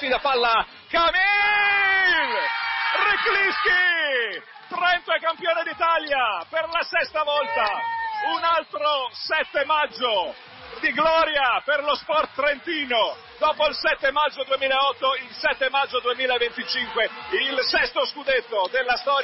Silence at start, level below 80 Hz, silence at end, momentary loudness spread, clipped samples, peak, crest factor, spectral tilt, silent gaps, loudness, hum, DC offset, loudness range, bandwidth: 0 s; -56 dBFS; 0 s; 7 LU; under 0.1%; -8 dBFS; 14 dB; -5 dB/octave; none; -22 LUFS; none; under 0.1%; 4 LU; 6 kHz